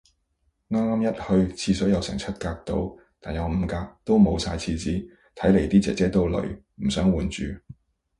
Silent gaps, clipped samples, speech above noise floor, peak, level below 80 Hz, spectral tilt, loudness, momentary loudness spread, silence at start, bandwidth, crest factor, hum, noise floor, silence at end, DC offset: none; under 0.1%; 48 dB; -6 dBFS; -38 dBFS; -6.5 dB/octave; -25 LUFS; 13 LU; 0.7 s; 11 kHz; 18 dB; none; -71 dBFS; 0.5 s; under 0.1%